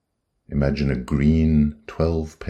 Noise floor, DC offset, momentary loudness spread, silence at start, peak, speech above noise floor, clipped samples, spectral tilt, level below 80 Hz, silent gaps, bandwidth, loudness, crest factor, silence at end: -55 dBFS; under 0.1%; 7 LU; 0.5 s; -6 dBFS; 35 dB; under 0.1%; -8.5 dB/octave; -30 dBFS; none; 8.6 kHz; -21 LUFS; 14 dB; 0 s